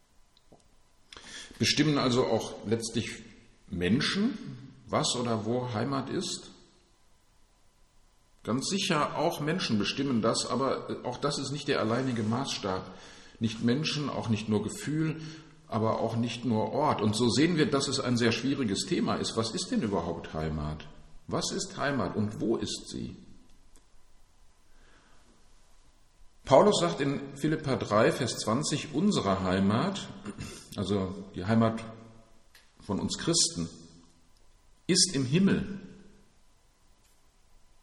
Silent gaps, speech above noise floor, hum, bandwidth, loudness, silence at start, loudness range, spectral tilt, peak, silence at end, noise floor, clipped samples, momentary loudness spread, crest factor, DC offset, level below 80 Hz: none; 33 dB; none; 12.5 kHz; -29 LUFS; 1.1 s; 6 LU; -4.5 dB/octave; -6 dBFS; 1.75 s; -62 dBFS; under 0.1%; 15 LU; 24 dB; under 0.1%; -56 dBFS